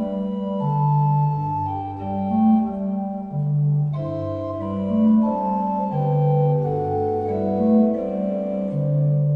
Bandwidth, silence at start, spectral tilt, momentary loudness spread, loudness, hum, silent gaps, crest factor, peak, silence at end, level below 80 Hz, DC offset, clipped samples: 3.8 kHz; 0 s; -12 dB/octave; 9 LU; -22 LUFS; none; none; 14 dB; -8 dBFS; 0 s; -54 dBFS; under 0.1%; under 0.1%